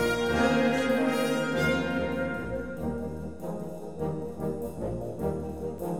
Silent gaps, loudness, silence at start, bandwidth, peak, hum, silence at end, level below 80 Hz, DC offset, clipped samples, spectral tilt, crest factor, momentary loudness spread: none; -30 LUFS; 0 s; 18.5 kHz; -12 dBFS; none; 0 s; -48 dBFS; 0.4%; under 0.1%; -6 dB/octave; 16 dB; 12 LU